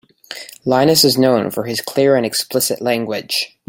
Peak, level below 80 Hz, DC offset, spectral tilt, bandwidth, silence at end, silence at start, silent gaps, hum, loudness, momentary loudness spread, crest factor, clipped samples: 0 dBFS; -58 dBFS; under 0.1%; -3.5 dB/octave; 17 kHz; 0.2 s; 0.3 s; none; none; -15 LUFS; 13 LU; 16 dB; under 0.1%